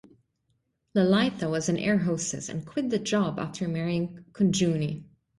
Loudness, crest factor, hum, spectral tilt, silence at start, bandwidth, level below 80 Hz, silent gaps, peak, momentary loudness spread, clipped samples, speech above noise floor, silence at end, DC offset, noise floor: -27 LUFS; 16 dB; none; -5.5 dB/octave; 0.95 s; 11.5 kHz; -60 dBFS; none; -12 dBFS; 9 LU; under 0.1%; 48 dB; 0.35 s; under 0.1%; -74 dBFS